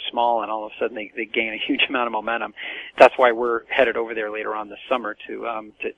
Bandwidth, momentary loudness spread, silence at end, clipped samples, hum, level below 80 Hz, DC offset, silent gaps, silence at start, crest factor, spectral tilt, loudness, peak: 11 kHz; 15 LU; 0.05 s; under 0.1%; none; -62 dBFS; under 0.1%; none; 0 s; 22 dB; -4 dB/octave; -22 LUFS; 0 dBFS